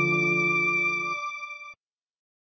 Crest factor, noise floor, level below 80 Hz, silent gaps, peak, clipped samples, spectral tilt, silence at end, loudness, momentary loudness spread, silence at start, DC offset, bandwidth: 14 dB; -55 dBFS; -80 dBFS; none; -14 dBFS; under 0.1%; -5 dB/octave; 0.8 s; -24 LUFS; 17 LU; 0 s; under 0.1%; 6.6 kHz